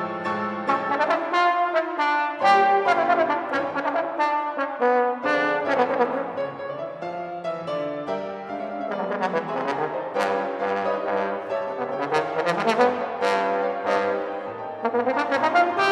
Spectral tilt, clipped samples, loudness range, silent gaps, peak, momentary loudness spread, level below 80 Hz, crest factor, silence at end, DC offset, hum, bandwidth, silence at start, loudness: -5 dB/octave; under 0.1%; 7 LU; none; -6 dBFS; 10 LU; -72 dBFS; 18 dB; 0 s; under 0.1%; none; 12 kHz; 0 s; -24 LUFS